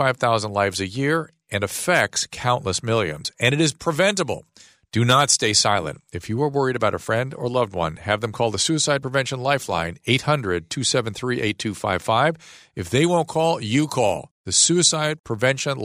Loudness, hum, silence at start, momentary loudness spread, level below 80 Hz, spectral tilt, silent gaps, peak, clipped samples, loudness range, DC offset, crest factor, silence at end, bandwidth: -21 LUFS; none; 0 s; 9 LU; -54 dBFS; -3.5 dB/octave; 14.31-14.44 s, 15.20-15.24 s; -2 dBFS; under 0.1%; 3 LU; under 0.1%; 18 dB; 0 s; 15.5 kHz